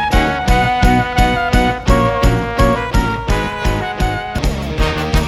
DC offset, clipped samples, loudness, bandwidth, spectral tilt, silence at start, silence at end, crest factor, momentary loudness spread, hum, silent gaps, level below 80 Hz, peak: under 0.1%; under 0.1%; -15 LUFS; 14.5 kHz; -5.5 dB/octave; 0 s; 0 s; 14 dB; 6 LU; none; none; -18 dBFS; 0 dBFS